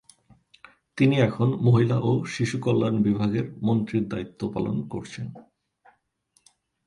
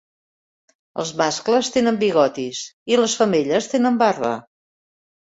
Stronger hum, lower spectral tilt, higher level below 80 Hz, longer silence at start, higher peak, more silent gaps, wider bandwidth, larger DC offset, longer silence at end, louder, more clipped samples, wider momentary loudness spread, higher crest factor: neither; first, -7.5 dB/octave vs -4 dB/octave; about the same, -58 dBFS vs -62 dBFS; about the same, 0.95 s vs 0.95 s; second, -8 dBFS vs -4 dBFS; second, none vs 2.73-2.86 s; first, 11 kHz vs 8 kHz; neither; first, 1.45 s vs 1 s; second, -24 LUFS vs -19 LUFS; neither; first, 14 LU vs 11 LU; about the same, 18 dB vs 18 dB